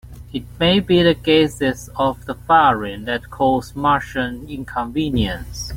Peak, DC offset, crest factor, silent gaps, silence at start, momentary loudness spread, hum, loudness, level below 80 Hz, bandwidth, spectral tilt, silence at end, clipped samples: -2 dBFS; under 0.1%; 16 dB; none; 0.05 s; 13 LU; none; -18 LUFS; -38 dBFS; 16.5 kHz; -5.5 dB/octave; 0 s; under 0.1%